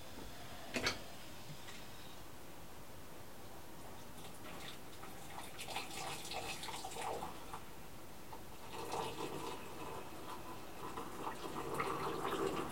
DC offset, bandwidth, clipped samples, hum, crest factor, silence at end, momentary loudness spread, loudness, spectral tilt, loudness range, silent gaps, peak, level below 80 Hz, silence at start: 0.3%; 16.5 kHz; under 0.1%; none; 24 dB; 0 s; 14 LU; -46 LUFS; -3.5 dB/octave; 8 LU; none; -22 dBFS; -66 dBFS; 0 s